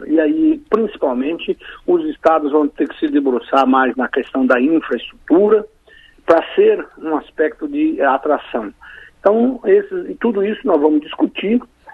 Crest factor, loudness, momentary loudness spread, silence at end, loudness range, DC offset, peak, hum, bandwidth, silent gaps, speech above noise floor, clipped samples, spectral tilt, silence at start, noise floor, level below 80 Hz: 16 dB; -16 LUFS; 9 LU; 0 s; 2 LU; under 0.1%; 0 dBFS; none; 6.4 kHz; none; 31 dB; under 0.1%; -7 dB/octave; 0 s; -47 dBFS; -52 dBFS